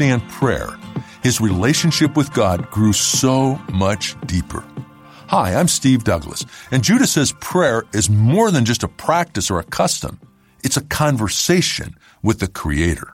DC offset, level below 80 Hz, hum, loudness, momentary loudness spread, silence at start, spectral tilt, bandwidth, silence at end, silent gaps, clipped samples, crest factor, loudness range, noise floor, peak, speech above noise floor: under 0.1%; -38 dBFS; none; -17 LUFS; 11 LU; 0 s; -4.5 dB/octave; 16.5 kHz; 0.05 s; none; under 0.1%; 16 dB; 3 LU; -40 dBFS; -2 dBFS; 23 dB